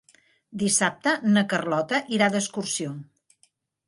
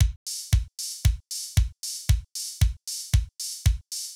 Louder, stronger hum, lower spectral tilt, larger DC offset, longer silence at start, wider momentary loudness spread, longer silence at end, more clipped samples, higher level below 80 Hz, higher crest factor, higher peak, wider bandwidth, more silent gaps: first, -24 LUFS vs -28 LUFS; neither; about the same, -3.5 dB/octave vs -3 dB/octave; neither; first, 0.5 s vs 0 s; first, 9 LU vs 6 LU; first, 0.85 s vs 0 s; neither; second, -70 dBFS vs -28 dBFS; about the same, 20 dB vs 16 dB; first, -6 dBFS vs -10 dBFS; second, 11.5 kHz vs 19 kHz; second, none vs 0.16-0.26 s